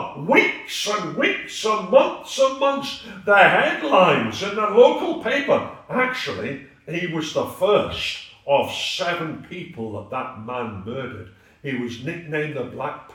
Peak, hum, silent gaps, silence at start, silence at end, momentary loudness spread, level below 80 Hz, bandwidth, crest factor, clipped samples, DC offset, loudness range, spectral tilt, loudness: 0 dBFS; none; none; 0 s; 0.1 s; 16 LU; -60 dBFS; 18 kHz; 22 dB; under 0.1%; under 0.1%; 12 LU; -4 dB/octave; -21 LUFS